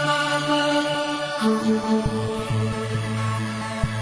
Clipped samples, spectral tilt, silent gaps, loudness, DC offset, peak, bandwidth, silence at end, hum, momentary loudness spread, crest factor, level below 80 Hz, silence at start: under 0.1%; -5 dB/octave; none; -23 LUFS; under 0.1%; -8 dBFS; 10.5 kHz; 0 s; none; 6 LU; 16 dB; -42 dBFS; 0 s